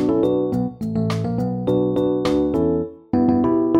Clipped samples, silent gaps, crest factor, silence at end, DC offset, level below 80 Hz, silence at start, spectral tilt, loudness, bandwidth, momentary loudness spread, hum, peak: under 0.1%; none; 14 dB; 0 s; under 0.1%; -44 dBFS; 0 s; -8.5 dB/octave; -20 LUFS; 11.5 kHz; 6 LU; none; -4 dBFS